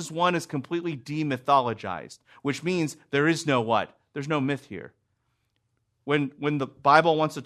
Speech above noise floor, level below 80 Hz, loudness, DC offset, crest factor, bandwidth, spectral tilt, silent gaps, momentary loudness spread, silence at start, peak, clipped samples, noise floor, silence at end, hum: 49 dB; -70 dBFS; -26 LUFS; under 0.1%; 24 dB; 13.5 kHz; -5.5 dB/octave; none; 16 LU; 0 s; -4 dBFS; under 0.1%; -74 dBFS; 0 s; none